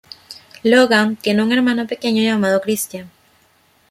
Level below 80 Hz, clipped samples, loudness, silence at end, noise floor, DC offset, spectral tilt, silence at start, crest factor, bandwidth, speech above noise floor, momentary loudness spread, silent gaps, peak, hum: -64 dBFS; under 0.1%; -16 LUFS; 0.85 s; -56 dBFS; under 0.1%; -4.5 dB/octave; 0.3 s; 16 dB; 15.5 kHz; 40 dB; 21 LU; none; -2 dBFS; none